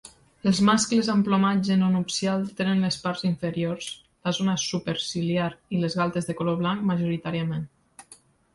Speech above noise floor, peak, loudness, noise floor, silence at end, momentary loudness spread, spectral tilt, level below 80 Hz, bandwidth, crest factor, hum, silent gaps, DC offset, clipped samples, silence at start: 30 dB; -8 dBFS; -25 LUFS; -55 dBFS; 0.4 s; 8 LU; -5 dB/octave; -60 dBFS; 11.5 kHz; 16 dB; none; none; under 0.1%; under 0.1%; 0.05 s